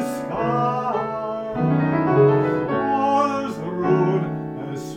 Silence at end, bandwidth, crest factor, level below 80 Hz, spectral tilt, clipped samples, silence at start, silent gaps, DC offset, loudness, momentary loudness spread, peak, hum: 0 s; 15.5 kHz; 16 dB; -54 dBFS; -8 dB/octave; under 0.1%; 0 s; none; under 0.1%; -21 LUFS; 10 LU; -4 dBFS; none